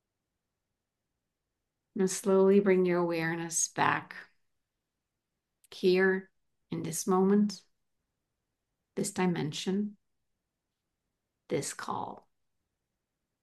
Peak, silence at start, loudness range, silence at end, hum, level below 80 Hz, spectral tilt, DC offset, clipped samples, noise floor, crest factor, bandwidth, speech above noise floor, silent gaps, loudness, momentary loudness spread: -10 dBFS; 1.95 s; 9 LU; 1.25 s; none; -78 dBFS; -5 dB/octave; under 0.1%; under 0.1%; -87 dBFS; 22 dB; 12.5 kHz; 58 dB; none; -29 LUFS; 17 LU